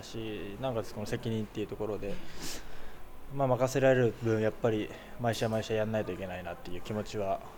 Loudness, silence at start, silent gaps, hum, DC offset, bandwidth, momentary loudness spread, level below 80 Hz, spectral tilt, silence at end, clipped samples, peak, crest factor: -33 LUFS; 0 s; none; none; under 0.1%; 19.5 kHz; 14 LU; -50 dBFS; -6 dB/octave; 0 s; under 0.1%; -14 dBFS; 18 dB